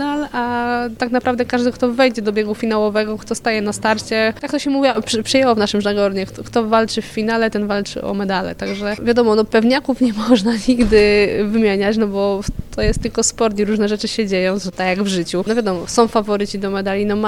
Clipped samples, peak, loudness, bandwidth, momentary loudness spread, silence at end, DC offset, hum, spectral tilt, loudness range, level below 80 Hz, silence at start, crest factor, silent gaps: under 0.1%; 0 dBFS; -17 LUFS; 15 kHz; 7 LU; 0 s; under 0.1%; none; -4.5 dB/octave; 3 LU; -36 dBFS; 0 s; 16 dB; none